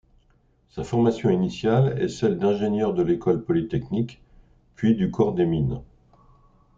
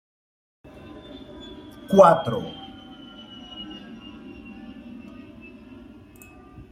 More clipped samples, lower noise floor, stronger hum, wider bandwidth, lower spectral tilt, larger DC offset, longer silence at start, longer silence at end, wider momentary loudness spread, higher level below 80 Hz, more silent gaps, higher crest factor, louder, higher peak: neither; first, -62 dBFS vs -47 dBFS; neither; second, 7.6 kHz vs 15.5 kHz; first, -8 dB/octave vs -6.5 dB/octave; neither; second, 0.75 s vs 1.15 s; second, 0.95 s vs 2.2 s; second, 7 LU vs 29 LU; first, -50 dBFS vs -56 dBFS; neither; second, 18 dB vs 24 dB; second, -23 LUFS vs -18 LUFS; second, -6 dBFS vs -2 dBFS